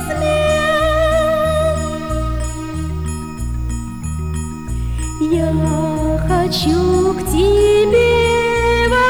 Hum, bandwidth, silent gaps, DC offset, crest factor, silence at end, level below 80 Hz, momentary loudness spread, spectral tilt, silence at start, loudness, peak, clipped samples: none; over 20 kHz; none; under 0.1%; 12 dB; 0 s; -24 dBFS; 12 LU; -5.5 dB/octave; 0 s; -16 LUFS; -4 dBFS; under 0.1%